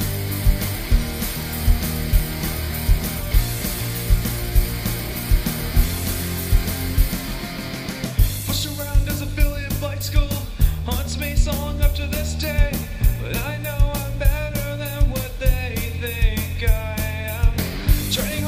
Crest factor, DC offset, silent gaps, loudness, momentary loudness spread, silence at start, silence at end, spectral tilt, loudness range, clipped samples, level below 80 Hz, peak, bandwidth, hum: 18 dB; under 0.1%; none; -23 LUFS; 4 LU; 0 s; 0 s; -4.5 dB/octave; 1 LU; under 0.1%; -22 dBFS; -4 dBFS; 15.5 kHz; none